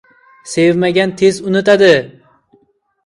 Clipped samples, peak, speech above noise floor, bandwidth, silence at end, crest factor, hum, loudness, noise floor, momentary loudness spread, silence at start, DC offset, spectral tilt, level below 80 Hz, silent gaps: under 0.1%; 0 dBFS; 46 dB; 11.5 kHz; 0.95 s; 14 dB; none; -12 LUFS; -57 dBFS; 7 LU; 0.45 s; under 0.1%; -5 dB/octave; -54 dBFS; none